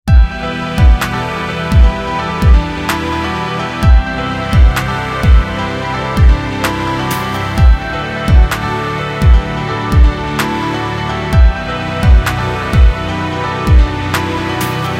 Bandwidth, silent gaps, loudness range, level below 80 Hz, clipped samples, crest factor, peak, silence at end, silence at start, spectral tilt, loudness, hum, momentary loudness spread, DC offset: 16 kHz; none; 1 LU; -14 dBFS; under 0.1%; 12 dB; 0 dBFS; 0 s; 0.05 s; -6 dB/octave; -14 LUFS; none; 6 LU; under 0.1%